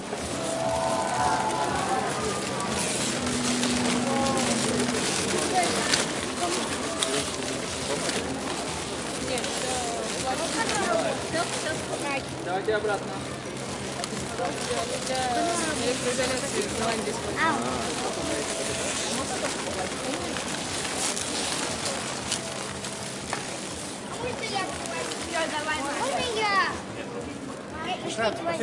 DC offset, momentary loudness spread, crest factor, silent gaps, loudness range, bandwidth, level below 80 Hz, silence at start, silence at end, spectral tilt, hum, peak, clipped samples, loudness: under 0.1%; 8 LU; 22 dB; none; 5 LU; 11.5 kHz; -54 dBFS; 0 s; 0 s; -2.5 dB/octave; none; -6 dBFS; under 0.1%; -27 LUFS